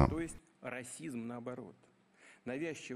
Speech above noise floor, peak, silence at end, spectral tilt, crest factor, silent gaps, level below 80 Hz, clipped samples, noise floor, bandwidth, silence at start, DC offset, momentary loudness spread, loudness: 22 dB; -12 dBFS; 0 s; -6 dB/octave; 28 dB; none; -50 dBFS; under 0.1%; -64 dBFS; 14.5 kHz; 0 s; under 0.1%; 13 LU; -42 LUFS